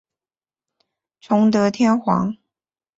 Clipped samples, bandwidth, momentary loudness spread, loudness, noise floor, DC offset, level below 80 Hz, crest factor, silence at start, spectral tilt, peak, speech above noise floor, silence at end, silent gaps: under 0.1%; 7.8 kHz; 9 LU; -18 LUFS; under -90 dBFS; under 0.1%; -60 dBFS; 16 dB; 1.3 s; -7 dB/octave; -6 dBFS; over 73 dB; 0.65 s; none